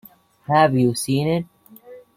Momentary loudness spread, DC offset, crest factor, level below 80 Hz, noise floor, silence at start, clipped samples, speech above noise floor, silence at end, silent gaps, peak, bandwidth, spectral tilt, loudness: 18 LU; under 0.1%; 18 dB; -56 dBFS; -44 dBFS; 0.5 s; under 0.1%; 26 dB; 0.15 s; none; -4 dBFS; 16 kHz; -6 dB/octave; -19 LUFS